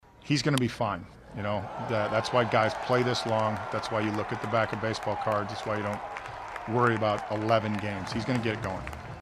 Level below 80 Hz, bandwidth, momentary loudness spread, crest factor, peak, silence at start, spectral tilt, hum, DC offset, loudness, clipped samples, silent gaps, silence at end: -54 dBFS; 13.5 kHz; 10 LU; 20 dB; -8 dBFS; 0.2 s; -5.5 dB/octave; none; under 0.1%; -29 LUFS; under 0.1%; none; 0 s